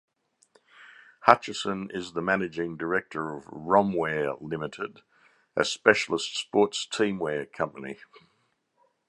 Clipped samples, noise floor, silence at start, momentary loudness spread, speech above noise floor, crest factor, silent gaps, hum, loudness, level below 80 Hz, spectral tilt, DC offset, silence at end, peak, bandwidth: under 0.1%; -72 dBFS; 0.8 s; 14 LU; 45 dB; 28 dB; none; none; -27 LUFS; -66 dBFS; -4 dB/octave; under 0.1%; 1.15 s; 0 dBFS; 11.5 kHz